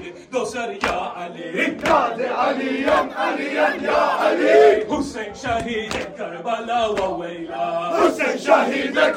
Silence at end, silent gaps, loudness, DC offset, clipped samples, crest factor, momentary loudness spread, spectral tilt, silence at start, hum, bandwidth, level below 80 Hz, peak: 0 s; none; -20 LUFS; under 0.1%; under 0.1%; 18 dB; 12 LU; -4 dB/octave; 0 s; none; 16 kHz; -50 dBFS; -2 dBFS